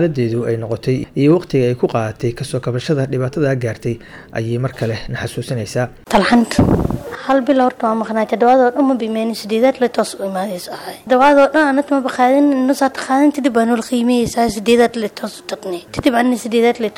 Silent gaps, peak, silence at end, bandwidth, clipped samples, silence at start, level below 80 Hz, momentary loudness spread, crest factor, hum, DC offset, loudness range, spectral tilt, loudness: none; -2 dBFS; 0.05 s; 16.5 kHz; under 0.1%; 0 s; -40 dBFS; 12 LU; 12 dB; none; under 0.1%; 6 LU; -6 dB/octave; -16 LUFS